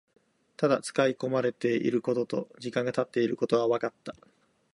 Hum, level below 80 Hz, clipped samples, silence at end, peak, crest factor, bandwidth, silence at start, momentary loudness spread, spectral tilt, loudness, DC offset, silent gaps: none; -74 dBFS; under 0.1%; 0.6 s; -10 dBFS; 18 dB; 11.5 kHz; 0.6 s; 8 LU; -6 dB/octave; -29 LUFS; under 0.1%; none